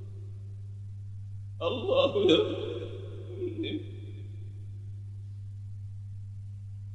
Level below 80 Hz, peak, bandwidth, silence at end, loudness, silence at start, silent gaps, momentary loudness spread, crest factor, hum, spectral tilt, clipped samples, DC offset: -58 dBFS; -10 dBFS; 8.2 kHz; 0 s; -33 LUFS; 0 s; none; 18 LU; 24 dB; 50 Hz at -40 dBFS; -7 dB/octave; under 0.1%; under 0.1%